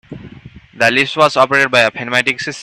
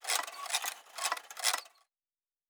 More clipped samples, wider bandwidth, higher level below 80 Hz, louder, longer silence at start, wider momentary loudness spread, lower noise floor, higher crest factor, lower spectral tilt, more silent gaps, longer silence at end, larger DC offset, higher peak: neither; second, 14 kHz vs over 20 kHz; first, -52 dBFS vs under -90 dBFS; first, -12 LUFS vs -34 LUFS; about the same, 0.1 s vs 0 s; about the same, 5 LU vs 6 LU; second, -38 dBFS vs under -90 dBFS; second, 16 dB vs 24 dB; first, -3.5 dB/octave vs 5 dB/octave; neither; second, 0 s vs 0.85 s; neither; first, 0 dBFS vs -14 dBFS